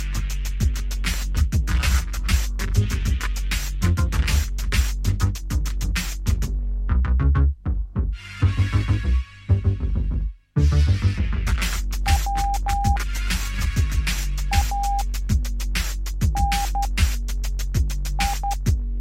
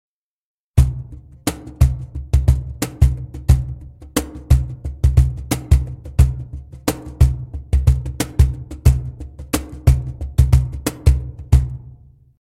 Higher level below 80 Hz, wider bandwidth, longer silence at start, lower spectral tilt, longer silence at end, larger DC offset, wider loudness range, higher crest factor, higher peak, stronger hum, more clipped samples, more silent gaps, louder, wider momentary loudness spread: about the same, -22 dBFS vs -20 dBFS; about the same, 16.5 kHz vs 16 kHz; second, 0 s vs 0.75 s; second, -4.5 dB/octave vs -6.5 dB/octave; second, 0 s vs 0.5 s; neither; about the same, 2 LU vs 1 LU; about the same, 16 dB vs 18 dB; second, -6 dBFS vs 0 dBFS; neither; neither; neither; second, -24 LUFS vs -19 LUFS; second, 6 LU vs 11 LU